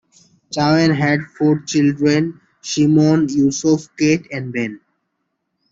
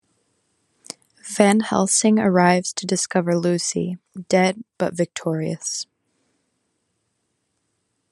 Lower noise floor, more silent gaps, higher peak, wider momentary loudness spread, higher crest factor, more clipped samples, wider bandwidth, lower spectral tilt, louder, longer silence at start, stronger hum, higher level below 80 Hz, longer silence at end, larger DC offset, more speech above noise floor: about the same, -73 dBFS vs -73 dBFS; neither; about the same, -2 dBFS vs 0 dBFS; second, 11 LU vs 18 LU; second, 14 dB vs 22 dB; neither; second, 7.8 kHz vs 12.5 kHz; about the same, -5.5 dB/octave vs -4.5 dB/octave; first, -17 LUFS vs -20 LUFS; second, 0.5 s vs 1.25 s; neither; first, -56 dBFS vs -66 dBFS; second, 0.95 s vs 2.3 s; neither; first, 57 dB vs 53 dB